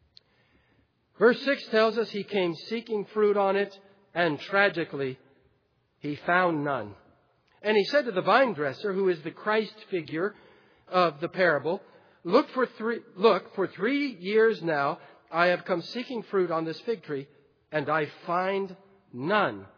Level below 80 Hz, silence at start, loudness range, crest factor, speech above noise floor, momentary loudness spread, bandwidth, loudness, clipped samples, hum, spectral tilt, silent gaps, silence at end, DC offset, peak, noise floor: -80 dBFS; 1.2 s; 3 LU; 20 dB; 43 dB; 11 LU; 5.4 kHz; -27 LUFS; under 0.1%; none; -6.5 dB/octave; none; 0.1 s; under 0.1%; -6 dBFS; -70 dBFS